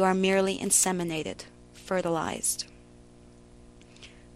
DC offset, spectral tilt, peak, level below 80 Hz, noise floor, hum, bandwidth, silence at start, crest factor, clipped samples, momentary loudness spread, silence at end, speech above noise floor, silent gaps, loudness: under 0.1%; -3 dB/octave; -10 dBFS; -58 dBFS; -53 dBFS; 60 Hz at -55 dBFS; 13.5 kHz; 0 s; 20 dB; under 0.1%; 19 LU; 0.25 s; 26 dB; none; -27 LUFS